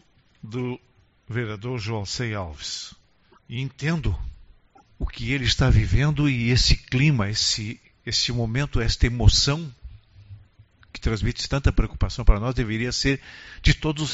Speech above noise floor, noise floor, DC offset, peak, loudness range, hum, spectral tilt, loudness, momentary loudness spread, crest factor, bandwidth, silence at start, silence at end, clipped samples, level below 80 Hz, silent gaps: 35 dB; -58 dBFS; under 0.1%; 0 dBFS; 9 LU; none; -4.5 dB/octave; -24 LUFS; 14 LU; 24 dB; 8 kHz; 0.45 s; 0 s; under 0.1%; -28 dBFS; none